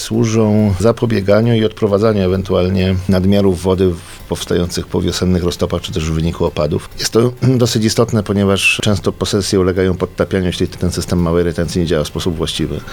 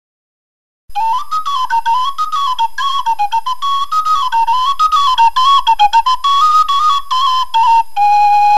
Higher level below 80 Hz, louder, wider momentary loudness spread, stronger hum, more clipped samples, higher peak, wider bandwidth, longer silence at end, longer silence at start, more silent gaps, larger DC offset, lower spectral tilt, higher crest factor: first, -34 dBFS vs -44 dBFS; second, -15 LUFS vs -12 LUFS; about the same, 6 LU vs 7 LU; neither; neither; about the same, 0 dBFS vs 0 dBFS; first, 19 kHz vs 13.5 kHz; about the same, 0 s vs 0 s; second, 0 s vs 0.95 s; neither; second, under 0.1% vs 8%; first, -5.5 dB/octave vs 2 dB/octave; about the same, 14 dB vs 12 dB